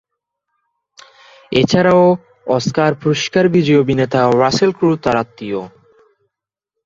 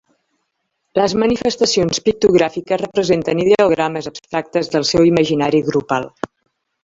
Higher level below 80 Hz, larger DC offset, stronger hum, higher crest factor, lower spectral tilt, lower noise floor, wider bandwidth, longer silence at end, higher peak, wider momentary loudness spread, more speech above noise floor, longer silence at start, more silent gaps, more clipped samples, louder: about the same, -50 dBFS vs -48 dBFS; neither; neither; about the same, 16 dB vs 16 dB; about the same, -6 dB/octave vs -5 dB/octave; first, -81 dBFS vs -72 dBFS; about the same, 7.8 kHz vs 7.8 kHz; first, 1.2 s vs 0.55 s; about the same, 0 dBFS vs -2 dBFS; about the same, 9 LU vs 10 LU; first, 68 dB vs 56 dB; first, 1.5 s vs 0.95 s; neither; neither; about the same, -15 LUFS vs -16 LUFS